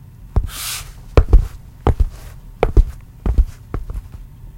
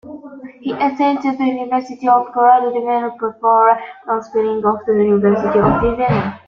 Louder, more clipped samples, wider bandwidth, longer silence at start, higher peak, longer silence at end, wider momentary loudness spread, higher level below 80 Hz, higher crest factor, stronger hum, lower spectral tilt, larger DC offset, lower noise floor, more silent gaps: second, -21 LUFS vs -16 LUFS; neither; first, 16.5 kHz vs 7 kHz; first, 0.2 s vs 0.05 s; about the same, 0 dBFS vs -2 dBFS; about the same, 0 s vs 0.1 s; first, 16 LU vs 10 LU; first, -18 dBFS vs -42 dBFS; about the same, 18 dB vs 14 dB; neither; second, -6 dB/octave vs -8.5 dB/octave; neither; about the same, -35 dBFS vs -34 dBFS; neither